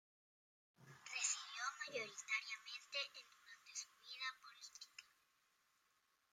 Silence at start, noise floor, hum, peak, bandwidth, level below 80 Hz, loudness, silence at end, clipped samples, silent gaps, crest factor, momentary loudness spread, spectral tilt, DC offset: 0.8 s; -82 dBFS; none; -26 dBFS; 16 kHz; under -90 dBFS; -46 LUFS; 1.25 s; under 0.1%; none; 24 dB; 18 LU; 1.5 dB/octave; under 0.1%